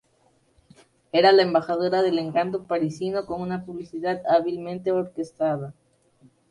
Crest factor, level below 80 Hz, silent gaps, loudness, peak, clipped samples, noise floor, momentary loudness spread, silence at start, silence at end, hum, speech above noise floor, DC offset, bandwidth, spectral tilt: 20 dB; -64 dBFS; none; -24 LUFS; -6 dBFS; under 0.1%; -64 dBFS; 13 LU; 1.15 s; 0.8 s; none; 41 dB; under 0.1%; 11 kHz; -6.5 dB/octave